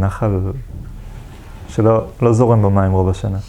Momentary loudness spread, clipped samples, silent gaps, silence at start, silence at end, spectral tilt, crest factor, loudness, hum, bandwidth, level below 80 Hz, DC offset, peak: 23 LU; under 0.1%; none; 0 s; 0 s; -9 dB/octave; 16 dB; -16 LUFS; none; 10 kHz; -34 dBFS; under 0.1%; 0 dBFS